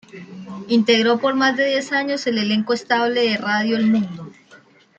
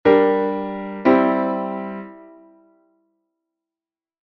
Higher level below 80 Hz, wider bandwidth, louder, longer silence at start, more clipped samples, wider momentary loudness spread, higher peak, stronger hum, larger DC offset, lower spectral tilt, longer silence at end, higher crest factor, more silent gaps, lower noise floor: second, -66 dBFS vs -58 dBFS; first, 8.2 kHz vs 5.8 kHz; about the same, -18 LUFS vs -19 LUFS; about the same, 0.15 s vs 0.05 s; neither; about the same, 18 LU vs 16 LU; about the same, -4 dBFS vs -2 dBFS; neither; neither; second, -4.5 dB/octave vs -9 dB/octave; second, 0.45 s vs 2.05 s; about the same, 16 dB vs 18 dB; neither; second, -50 dBFS vs under -90 dBFS